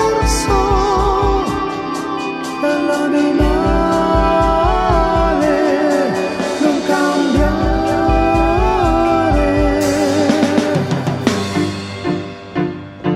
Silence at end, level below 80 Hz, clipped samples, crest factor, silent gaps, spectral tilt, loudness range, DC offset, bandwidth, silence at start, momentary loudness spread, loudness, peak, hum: 0 s; -24 dBFS; under 0.1%; 14 dB; none; -5.5 dB/octave; 2 LU; under 0.1%; 14.5 kHz; 0 s; 8 LU; -15 LUFS; 0 dBFS; none